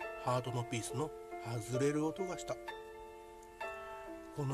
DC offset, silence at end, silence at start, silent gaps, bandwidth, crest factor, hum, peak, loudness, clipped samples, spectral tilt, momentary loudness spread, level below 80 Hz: under 0.1%; 0 s; 0 s; none; 14 kHz; 18 dB; none; -22 dBFS; -40 LUFS; under 0.1%; -5.5 dB/octave; 16 LU; -64 dBFS